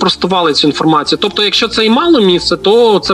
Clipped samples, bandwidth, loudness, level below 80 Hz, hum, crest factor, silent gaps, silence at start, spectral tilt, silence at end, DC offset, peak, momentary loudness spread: under 0.1%; 13 kHz; -10 LUFS; -42 dBFS; none; 10 dB; none; 0 s; -4.5 dB/octave; 0 s; under 0.1%; 0 dBFS; 3 LU